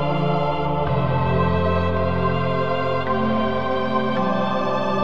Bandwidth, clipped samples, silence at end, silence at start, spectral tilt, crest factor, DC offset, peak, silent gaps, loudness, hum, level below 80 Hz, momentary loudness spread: 7.2 kHz; under 0.1%; 0 s; 0 s; -8.5 dB/octave; 12 dB; 3%; -8 dBFS; none; -21 LUFS; none; -40 dBFS; 2 LU